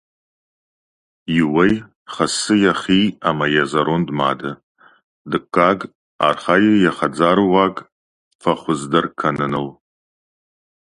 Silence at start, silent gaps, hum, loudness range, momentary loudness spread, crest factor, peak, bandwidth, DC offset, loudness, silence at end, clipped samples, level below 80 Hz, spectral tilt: 1.3 s; 1.95-2.06 s, 4.63-4.75 s, 5.04-5.25 s, 5.95-6.19 s, 7.92-8.39 s; none; 3 LU; 10 LU; 18 dB; 0 dBFS; 11.5 kHz; under 0.1%; -17 LUFS; 1.1 s; under 0.1%; -52 dBFS; -5 dB/octave